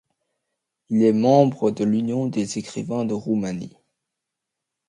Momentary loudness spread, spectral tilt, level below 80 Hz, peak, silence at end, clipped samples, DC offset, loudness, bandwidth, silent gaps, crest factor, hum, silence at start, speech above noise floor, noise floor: 12 LU; -7 dB/octave; -64 dBFS; -2 dBFS; 1.2 s; under 0.1%; under 0.1%; -21 LUFS; 10.5 kHz; none; 20 dB; none; 0.9 s; 63 dB; -83 dBFS